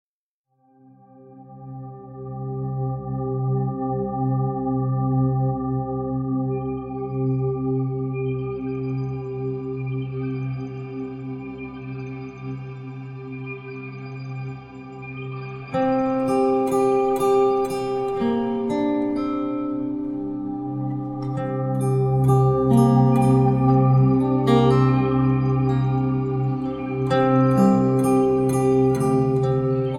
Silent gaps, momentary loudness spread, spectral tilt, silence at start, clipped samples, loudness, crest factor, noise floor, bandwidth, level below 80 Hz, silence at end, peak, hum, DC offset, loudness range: none; 16 LU; -8.5 dB/octave; 1.2 s; under 0.1%; -22 LUFS; 18 dB; -55 dBFS; 12 kHz; -48 dBFS; 0 s; -4 dBFS; none; under 0.1%; 14 LU